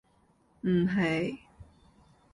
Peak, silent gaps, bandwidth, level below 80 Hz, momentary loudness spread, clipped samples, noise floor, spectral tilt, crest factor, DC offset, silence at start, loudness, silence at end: -18 dBFS; none; 11 kHz; -60 dBFS; 10 LU; under 0.1%; -67 dBFS; -7.5 dB/octave; 16 dB; under 0.1%; 0.65 s; -29 LUFS; 0.7 s